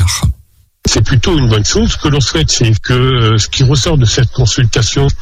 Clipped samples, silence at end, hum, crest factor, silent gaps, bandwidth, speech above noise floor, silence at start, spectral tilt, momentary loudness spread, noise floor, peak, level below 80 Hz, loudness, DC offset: under 0.1%; 0 s; none; 10 dB; none; 14.5 kHz; 35 dB; 0 s; -4.5 dB/octave; 3 LU; -45 dBFS; 0 dBFS; -22 dBFS; -11 LUFS; under 0.1%